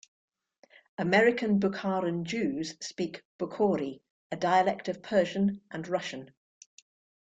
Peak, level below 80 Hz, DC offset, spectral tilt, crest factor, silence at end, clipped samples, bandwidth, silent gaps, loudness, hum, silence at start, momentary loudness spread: -10 dBFS; -70 dBFS; under 0.1%; -5.5 dB/octave; 20 dB; 1 s; under 0.1%; 8 kHz; 3.25-3.39 s, 4.10-4.30 s; -29 LUFS; none; 1 s; 14 LU